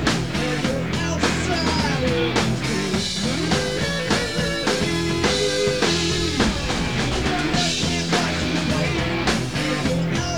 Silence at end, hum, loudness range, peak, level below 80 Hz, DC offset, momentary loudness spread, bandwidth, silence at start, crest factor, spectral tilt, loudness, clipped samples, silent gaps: 0 s; none; 1 LU; -6 dBFS; -36 dBFS; 0.8%; 3 LU; 19 kHz; 0 s; 16 dB; -4 dB/octave; -21 LUFS; under 0.1%; none